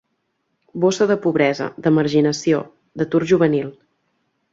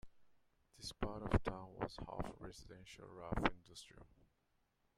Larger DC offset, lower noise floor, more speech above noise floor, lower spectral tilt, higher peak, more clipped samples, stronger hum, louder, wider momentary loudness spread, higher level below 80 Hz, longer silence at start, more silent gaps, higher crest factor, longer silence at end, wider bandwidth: neither; second, -71 dBFS vs -81 dBFS; first, 54 dB vs 38 dB; about the same, -6 dB/octave vs -6 dB/octave; first, -4 dBFS vs -14 dBFS; neither; neither; first, -18 LUFS vs -44 LUFS; second, 10 LU vs 17 LU; second, -60 dBFS vs -54 dBFS; first, 0.75 s vs 0.05 s; neither; second, 16 dB vs 30 dB; about the same, 0.8 s vs 0.9 s; second, 7.8 kHz vs 14.5 kHz